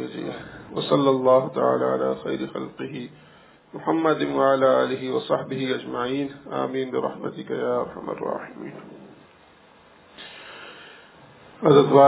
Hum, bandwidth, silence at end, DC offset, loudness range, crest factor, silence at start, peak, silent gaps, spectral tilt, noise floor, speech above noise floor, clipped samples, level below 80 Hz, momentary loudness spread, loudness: none; 4 kHz; 0 s; under 0.1%; 10 LU; 22 dB; 0 s; -2 dBFS; none; -10.5 dB/octave; -53 dBFS; 31 dB; under 0.1%; -64 dBFS; 21 LU; -24 LUFS